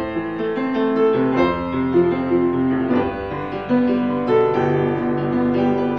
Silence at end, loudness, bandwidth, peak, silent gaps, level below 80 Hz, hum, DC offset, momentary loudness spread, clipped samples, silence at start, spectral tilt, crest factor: 0 s; -19 LUFS; 5.8 kHz; -6 dBFS; none; -44 dBFS; none; 0.3%; 6 LU; under 0.1%; 0 s; -9 dB/octave; 12 dB